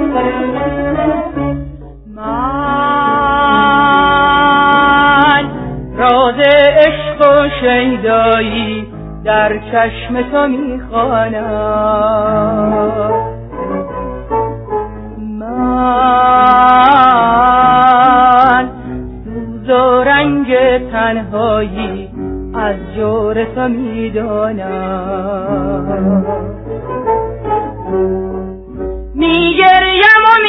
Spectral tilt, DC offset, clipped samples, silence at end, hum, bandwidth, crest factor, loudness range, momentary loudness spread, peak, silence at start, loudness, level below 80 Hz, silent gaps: -8 dB/octave; under 0.1%; 0.2%; 0 s; none; 5.4 kHz; 12 dB; 8 LU; 16 LU; 0 dBFS; 0 s; -11 LUFS; -32 dBFS; none